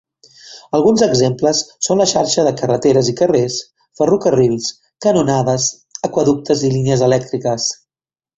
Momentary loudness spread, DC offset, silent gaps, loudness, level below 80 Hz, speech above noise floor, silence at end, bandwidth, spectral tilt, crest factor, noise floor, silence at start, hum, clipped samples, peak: 7 LU; under 0.1%; none; -15 LUFS; -52 dBFS; over 76 dB; 0.65 s; 8.2 kHz; -5 dB/octave; 14 dB; under -90 dBFS; 0.45 s; none; under 0.1%; 0 dBFS